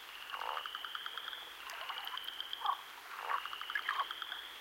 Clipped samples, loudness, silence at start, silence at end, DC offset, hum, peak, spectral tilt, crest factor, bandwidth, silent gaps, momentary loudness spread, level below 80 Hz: under 0.1%; -41 LUFS; 0 s; 0 s; under 0.1%; none; -20 dBFS; 1 dB/octave; 22 dB; 17 kHz; none; 7 LU; -80 dBFS